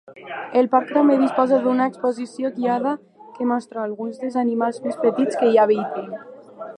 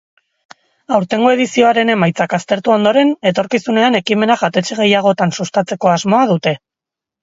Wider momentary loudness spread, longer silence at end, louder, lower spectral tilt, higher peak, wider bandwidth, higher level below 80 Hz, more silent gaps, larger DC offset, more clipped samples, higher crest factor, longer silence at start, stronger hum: first, 14 LU vs 6 LU; second, 0.05 s vs 0.65 s; second, -20 LUFS vs -14 LUFS; first, -6.5 dB/octave vs -5 dB/octave; about the same, -2 dBFS vs 0 dBFS; first, 10 kHz vs 7.8 kHz; second, -78 dBFS vs -58 dBFS; neither; neither; neither; about the same, 18 dB vs 14 dB; second, 0.1 s vs 0.9 s; neither